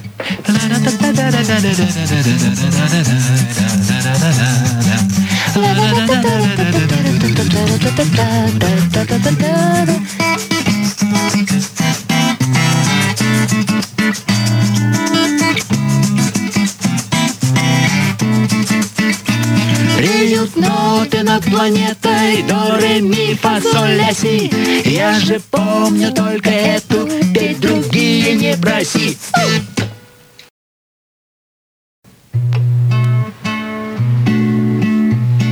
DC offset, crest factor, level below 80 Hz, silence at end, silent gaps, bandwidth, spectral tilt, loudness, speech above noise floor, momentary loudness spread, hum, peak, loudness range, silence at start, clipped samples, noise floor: under 0.1%; 12 dB; -44 dBFS; 0 s; 30.50-32.03 s; 19.5 kHz; -5 dB/octave; -13 LUFS; 29 dB; 3 LU; none; 0 dBFS; 4 LU; 0 s; under 0.1%; -42 dBFS